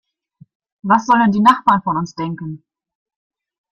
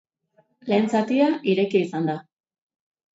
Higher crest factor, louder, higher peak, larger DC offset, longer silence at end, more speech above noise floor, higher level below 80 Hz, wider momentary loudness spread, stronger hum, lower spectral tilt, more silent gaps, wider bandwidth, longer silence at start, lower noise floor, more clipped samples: about the same, 18 dB vs 16 dB; first, -15 LUFS vs -22 LUFS; first, 0 dBFS vs -8 dBFS; neither; first, 1.15 s vs 0.95 s; second, 35 dB vs 43 dB; first, -58 dBFS vs -72 dBFS; first, 18 LU vs 9 LU; neither; about the same, -6 dB/octave vs -7 dB/octave; neither; first, 9.8 kHz vs 8 kHz; first, 0.85 s vs 0.65 s; second, -50 dBFS vs -64 dBFS; neither